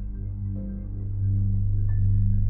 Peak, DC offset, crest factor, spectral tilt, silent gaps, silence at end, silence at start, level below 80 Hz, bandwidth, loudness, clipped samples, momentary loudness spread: -12 dBFS; under 0.1%; 12 dB; -15.5 dB/octave; none; 0 s; 0 s; -28 dBFS; 1.9 kHz; -27 LUFS; under 0.1%; 10 LU